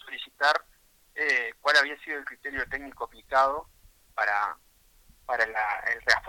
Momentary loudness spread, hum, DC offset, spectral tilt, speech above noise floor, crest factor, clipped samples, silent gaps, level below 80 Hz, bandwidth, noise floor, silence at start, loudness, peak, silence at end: 16 LU; none; under 0.1%; -1 dB/octave; 34 dB; 24 dB; under 0.1%; none; -58 dBFS; 18 kHz; -61 dBFS; 0.05 s; -27 LUFS; -4 dBFS; 0 s